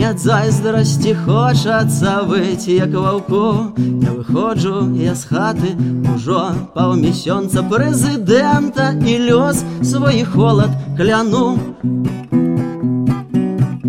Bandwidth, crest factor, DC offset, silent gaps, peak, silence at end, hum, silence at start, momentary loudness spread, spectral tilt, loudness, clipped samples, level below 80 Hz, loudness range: 15.5 kHz; 12 dB; 0.1%; none; -2 dBFS; 0 s; none; 0 s; 5 LU; -6.5 dB/octave; -15 LUFS; under 0.1%; -44 dBFS; 3 LU